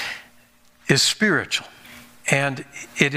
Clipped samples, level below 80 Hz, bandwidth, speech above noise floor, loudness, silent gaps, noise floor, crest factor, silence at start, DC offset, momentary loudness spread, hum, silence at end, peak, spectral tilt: under 0.1%; -62 dBFS; 16 kHz; 33 dB; -20 LUFS; none; -55 dBFS; 24 dB; 0 s; under 0.1%; 17 LU; none; 0 s; 0 dBFS; -3 dB/octave